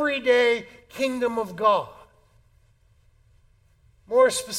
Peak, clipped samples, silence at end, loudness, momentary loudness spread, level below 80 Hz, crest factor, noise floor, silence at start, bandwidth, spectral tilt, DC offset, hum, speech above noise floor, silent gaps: -8 dBFS; under 0.1%; 0 s; -23 LUFS; 9 LU; -60 dBFS; 18 dB; -60 dBFS; 0 s; 15.5 kHz; -2.5 dB/octave; under 0.1%; none; 38 dB; none